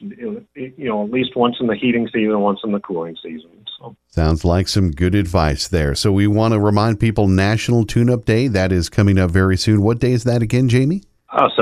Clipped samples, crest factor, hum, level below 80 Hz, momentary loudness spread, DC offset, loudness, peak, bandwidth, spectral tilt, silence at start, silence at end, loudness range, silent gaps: under 0.1%; 16 dB; none; -32 dBFS; 14 LU; under 0.1%; -17 LUFS; 0 dBFS; 14 kHz; -6.5 dB/octave; 0 s; 0 s; 4 LU; none